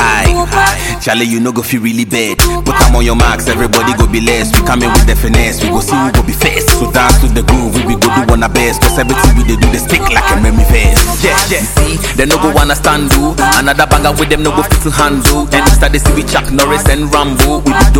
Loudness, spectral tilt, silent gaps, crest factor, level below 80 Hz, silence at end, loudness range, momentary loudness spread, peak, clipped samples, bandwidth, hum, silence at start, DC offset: -9 LUFS; -4 dB/octave; none; 8 dB; -12 dBFS; 0 s; 1 LU; 3 LU; 0 dBFS; 0.4%; 17.5 kHz; none; 0 s; 1%